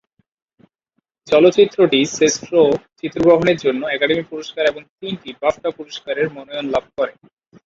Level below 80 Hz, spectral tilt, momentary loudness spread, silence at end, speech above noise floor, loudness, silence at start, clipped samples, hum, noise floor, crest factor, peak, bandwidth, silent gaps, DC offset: -54 dBFS; -4 dB/octave; 15 LU; 0.55 s; 55 dB; -17 LUFS; 1.25 s; under 0.1%; none; -72 dBFS; 18 dB; 0 dBFS; 7.8 kHz; 4.89-4.98 s; under 0.1%